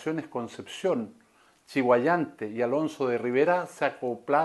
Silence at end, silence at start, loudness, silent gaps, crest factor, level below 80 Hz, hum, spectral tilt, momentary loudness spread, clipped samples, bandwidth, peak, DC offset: 0 s; 0 s; -28 LUFS; none; 18 dB; -76 dBFS; none; -6 dB/octave; 11 LU; under 0.1%; 12.5 kHz; -10 dBFS; under 0.1%